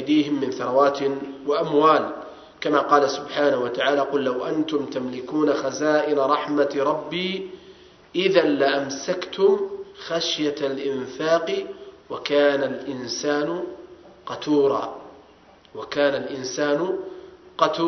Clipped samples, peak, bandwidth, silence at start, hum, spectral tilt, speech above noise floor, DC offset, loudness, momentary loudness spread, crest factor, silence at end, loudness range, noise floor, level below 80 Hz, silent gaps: under 0.1%; 0 dBFS; 6.4 kHz; 0 s; none; -4.5 dB/octave; 30 dB; under 0.1%; -23 LUFS; 15 LU; 22 dB; 0 s; 4 LU; -52 dBFS; -66 dBFS; none